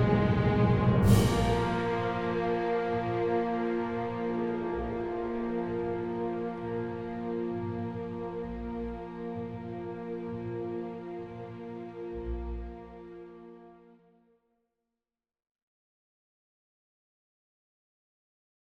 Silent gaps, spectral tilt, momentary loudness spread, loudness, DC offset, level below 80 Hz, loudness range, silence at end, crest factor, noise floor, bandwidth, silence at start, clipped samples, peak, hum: none; -7.5 dB/octave; 16 LU; -31 LUFS; under 0.1%; -46 dBFS; 15 LU; 4.95 s; 22 dB; under -90 dBFS; 16 kHz; 0 s; under 0.1%; -10 dBFS; none